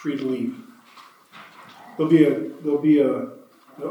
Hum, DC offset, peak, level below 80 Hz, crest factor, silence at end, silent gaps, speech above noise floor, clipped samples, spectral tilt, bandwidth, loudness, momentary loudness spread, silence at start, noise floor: none; under 0.1%; -4 dBFS; -84 dBFS; 20 dB; 0 s; none; 29 dB; under 0.1%; -8 dB/octave; 12 kHz; -21 LUFS; 19 LU; 0 s; -49 dBFS